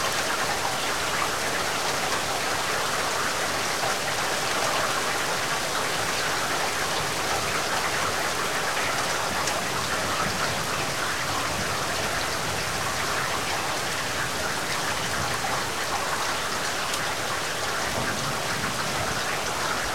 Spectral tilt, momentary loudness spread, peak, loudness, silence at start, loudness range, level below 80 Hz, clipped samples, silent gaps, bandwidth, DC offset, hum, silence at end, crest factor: -2 dB/octave; 2 LU; -10 dBFS; -25 LUFS; 0 s; 1 LU; -52 dBFS; under 0.1%; none; 16.5 kHz; 1%; none; 0 s; 16 dB